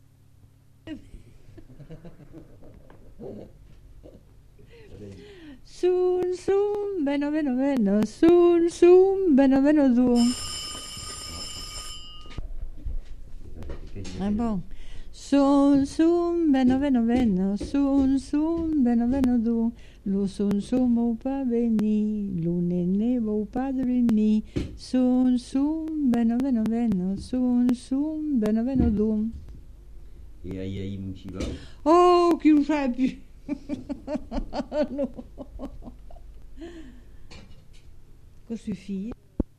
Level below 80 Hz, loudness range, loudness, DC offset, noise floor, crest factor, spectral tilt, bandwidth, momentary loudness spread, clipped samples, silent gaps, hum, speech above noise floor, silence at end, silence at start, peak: -42 dBFS; 14 LU; -24 LUFS; under 0.1%; -54 dBFS; 18 dB; -6.5 dB/octave; 12.5 kHz; 22 LU; under 0.1%; none; none; 31 dB; 0.15 s; 0.85 s; -8 dBFS